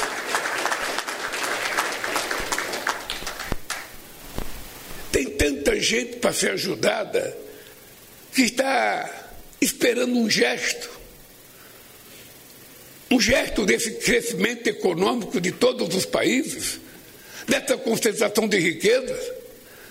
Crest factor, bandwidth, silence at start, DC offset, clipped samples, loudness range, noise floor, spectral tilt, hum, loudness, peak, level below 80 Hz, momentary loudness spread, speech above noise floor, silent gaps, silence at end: 20 dB; 16 kHz; 0 s; under 0.1%; under 0.1%; 4 LU; -47 dBFS; -3 dB/octave; none; -23 LUFS; -4 dBFS; -44 dBFS; 22 LU; 25 dB; none; 0 s